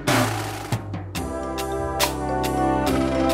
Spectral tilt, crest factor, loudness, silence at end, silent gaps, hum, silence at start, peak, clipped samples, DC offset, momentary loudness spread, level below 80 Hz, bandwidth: -4.5 dB/octave; 18 dB; -24 LUFS; 0 s; none; none; 0 s; -6 dBFS; under 0.1%; under 0.1%; 8 LU; -36 dBFS; 16 kHz